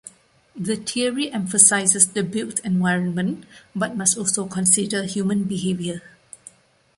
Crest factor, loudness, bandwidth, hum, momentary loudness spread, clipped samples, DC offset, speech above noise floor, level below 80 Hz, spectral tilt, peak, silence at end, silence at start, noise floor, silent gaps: 22 dB; -20 LUFS; 12.5 kHz; none; 14 LU; under 0.1%; under 0.1%; 30 dB; -62 dBFS; -3 dB/octave; 0 dBFS; 0.95 s; 0.05 s; -51 dBFS; none